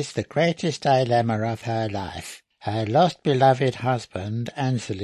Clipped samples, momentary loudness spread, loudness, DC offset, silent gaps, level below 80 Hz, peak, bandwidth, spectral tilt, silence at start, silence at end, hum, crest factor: under 0.1%; 11 LU; -23 LUFS; under 0.1%; none; -52 dBFS; -6 dBFS; 12.5 kHz; -6 dB/octave; 0 s; 0 s; none; 16 dB